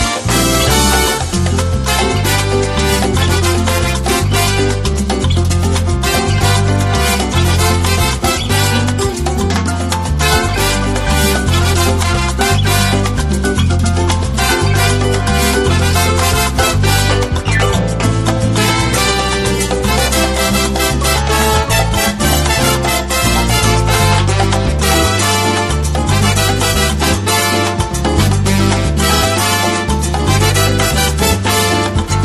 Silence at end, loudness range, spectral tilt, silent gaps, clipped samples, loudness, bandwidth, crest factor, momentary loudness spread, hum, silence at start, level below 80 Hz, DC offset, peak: 0 s; 1 LU; -4 dB/octave; none; under 0.1%; -13 LUFS; 13 kHz; 12 dB; 3 LU; none; 0 s; -20 dBFS; under 0.1%; 0 dBFS